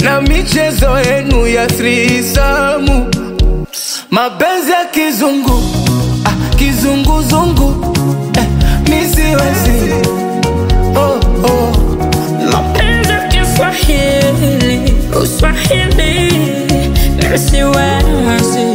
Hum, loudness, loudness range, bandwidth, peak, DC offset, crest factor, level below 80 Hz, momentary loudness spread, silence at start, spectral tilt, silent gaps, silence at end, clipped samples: none; -11 LUFS; 1 LU; 16.5 kHz; 0 dBFS; under 0.1%; 10 dB; -16 dBFS; 3 LU; 0 s; -5 dB/octave; none; 0 s; under 0.1%